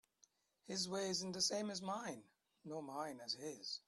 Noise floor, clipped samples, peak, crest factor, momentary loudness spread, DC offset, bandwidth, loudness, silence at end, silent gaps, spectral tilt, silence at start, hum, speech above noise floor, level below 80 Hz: -77 dBFS; under 0.1%; -26 dBFS; 20 dB; 12 LU; under 0.1%; 13.5 kHz; -43 LUFS; 0.1 s; none; -2.5 dB/octave; 0.65 s; none; 32 dB; -84 dBFS